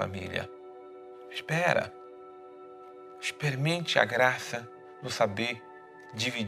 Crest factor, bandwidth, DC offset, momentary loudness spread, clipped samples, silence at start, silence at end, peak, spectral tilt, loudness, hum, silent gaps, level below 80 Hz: 26 dB; 15.5 kHz; under 0.1%; 22 LU; under 0.1%; 0 s; 0 s; -6 dBFS; -4.5 dB/octave; -30 LUFS; none; none; -72 dBFS